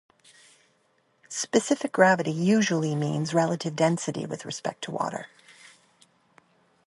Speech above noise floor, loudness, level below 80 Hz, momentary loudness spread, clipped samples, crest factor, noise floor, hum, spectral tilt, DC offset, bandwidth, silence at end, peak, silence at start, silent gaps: 43 dB; -26 LUFS; -72 dBFS; 13 LU; under 0.1%; 22 dB; -68 dBFS; none; -5 dB/octave; under 0.1%; 11.5 kHz; 1.6 s; -6 dBFS; 1.3 s; none